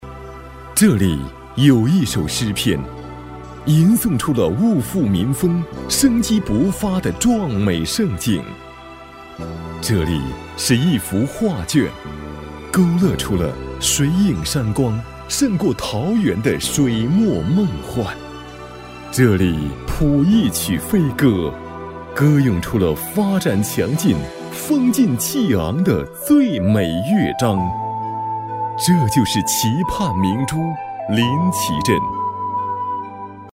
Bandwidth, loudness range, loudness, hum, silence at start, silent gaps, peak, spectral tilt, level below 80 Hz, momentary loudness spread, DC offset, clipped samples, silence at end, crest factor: 16.5 kHz; 3 LU; -18 LUFS; none; 0 s; none; 0 dBFS; -5.5 dB/octave; -38 dBFS; 16 LU; under 0.1%; under 0.1%; 0.05 s; 16 dB